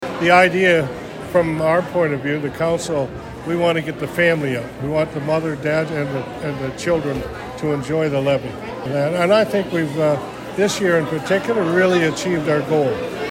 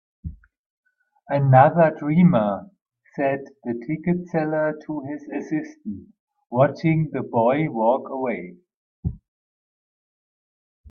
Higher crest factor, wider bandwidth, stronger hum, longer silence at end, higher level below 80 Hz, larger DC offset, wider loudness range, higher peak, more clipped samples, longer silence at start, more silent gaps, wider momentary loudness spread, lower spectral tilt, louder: about the same, 18 dB vs 22 dB; first, 16.5 kHz vs 6.4 kHz; neither; second, 0 s vs 1.75 s; first, -46 dBFS vs -52 dBFS; neither; second, 4 LU vs 7 LU; about the same, -2 dBFS vs 0 dBFS; neither; second, 0 s vs 0.25 s; second, none vs 0.58-0.83 s, 6.19-6.27 s, 8.76-9.03 s; second, 10 LU vs 18 LU; second, -5.5 dB/octave vs -10 dB/octave; first, -19 LUFS vs -22 LUFS